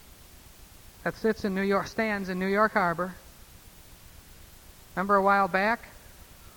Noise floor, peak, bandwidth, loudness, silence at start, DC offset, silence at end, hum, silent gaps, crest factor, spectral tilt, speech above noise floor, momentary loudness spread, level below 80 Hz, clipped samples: -51 dBFS; -10 dBFS; over 20 kHz; -27 LUFS; 0.35 s; under 0.1%; 0.1 s; none; none; 20 dB; -6 dB/octave; 25 dB; 13 LU; -54 dBFS; under 0.1%